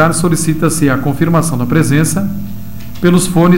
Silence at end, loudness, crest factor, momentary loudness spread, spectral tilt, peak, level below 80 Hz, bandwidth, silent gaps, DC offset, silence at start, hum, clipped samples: 0 s; -12 LUFS; 12 dB; 13 LU; -6 dB/octave; 0 dBFS; -34 dBFS; 16.5 kHz; none; 7%; 0 s; 60 Hz at -35 dBFS; under 0.1%